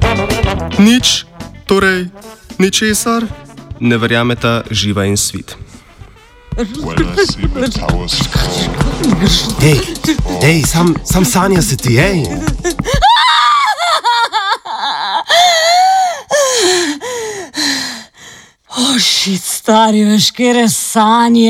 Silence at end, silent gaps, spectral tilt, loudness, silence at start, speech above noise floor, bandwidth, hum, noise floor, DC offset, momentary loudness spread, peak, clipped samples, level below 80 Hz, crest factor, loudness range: 0 s; none; -4 dB/octave; -12 LUFS; 0 s; 27 dB; 17 kHz; none; -39 dBFS; under 0.1%; 11 LU; 0 dBFS; under 0.1%; -26 dBFS; 12 dB; 5 LU